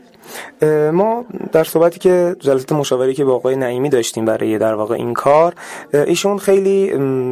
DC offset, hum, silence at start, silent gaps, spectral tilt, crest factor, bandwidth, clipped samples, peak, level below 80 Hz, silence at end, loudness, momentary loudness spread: under 0.1%; none; 0.25 s; none; -5.5 dB/octave; 14 dB; 15.5 kHz; under 0.1%; -2 dBFS; -58 dBFS; 0 s; -15 LUFS; 6 LU